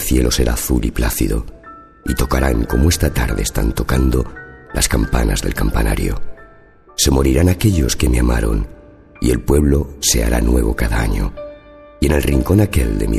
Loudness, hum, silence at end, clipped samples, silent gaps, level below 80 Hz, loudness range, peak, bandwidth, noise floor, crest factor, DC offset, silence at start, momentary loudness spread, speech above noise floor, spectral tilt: -17 LUFS; none; 0 s; under 0.1%; none; -20 dBFS; 2 LU; 0 dBFS; 14 kHz; -44 dBFS; 16 dB; under 0.1%; 0 s; 10 LU; 29 dB; -5 dB/octave